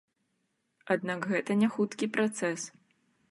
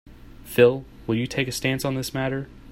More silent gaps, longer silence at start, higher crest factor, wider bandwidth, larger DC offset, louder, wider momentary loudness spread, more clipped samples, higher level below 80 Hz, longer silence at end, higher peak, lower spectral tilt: neither; first, 0.85 s vs 0.05 s; about the same, 20 dB vs 22 dB; second, 11.5 kHz vs 16 kHz; neither; second, -30 LUFS vs -24 LUFS; second, 6 LU vs 10 LU; neither; second, -80 dBFS vs -48 dBFS; first, 0.6 s vs 0 s; second, -14 dBFS vs -4 dBFS; about the same, -5 dB/octave vs -5.5 dB/octave